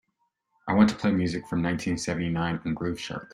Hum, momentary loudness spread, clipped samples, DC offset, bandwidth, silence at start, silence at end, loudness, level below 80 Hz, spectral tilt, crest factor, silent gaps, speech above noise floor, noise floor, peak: none; 9 LU; under 0.1%; under 0.1%; 11.5 kHz; 0.65 s; 0.1 s; -27 LUFS; -54 dBFS; -6 dB/octave; 22 dB; none; 50 dB; -76 dBFS; -6 dBFS